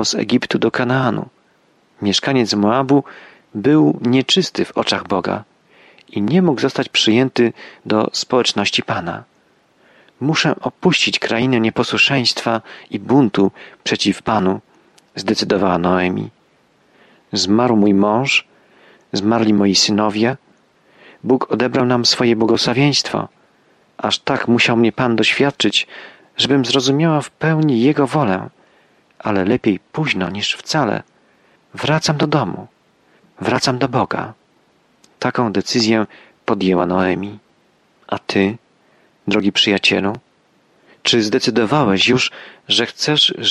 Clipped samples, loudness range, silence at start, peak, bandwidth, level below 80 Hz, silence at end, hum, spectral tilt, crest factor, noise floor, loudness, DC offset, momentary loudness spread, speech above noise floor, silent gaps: under 0.1%; 4 LU; 0 s; -2 dBFS; 12 kHz; -56 dBFS; 0 s; none; -4.5 dB/octave; 16 dB; -57 dBFS; -16 LUFS; under 0.1%; 12 LU; 41 dB; none